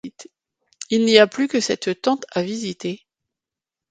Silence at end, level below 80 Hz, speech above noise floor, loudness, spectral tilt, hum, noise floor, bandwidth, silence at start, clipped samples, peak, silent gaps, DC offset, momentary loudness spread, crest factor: 0.95 s; -66 dBFS; 68 dB; -20 LUFS; -4 dB/octave; none; -88 dBFS; 9.4 kHz; 0.05 s; under 0.1%; 0 dBFS; none; under 0.1%; 19 LU; 22 dB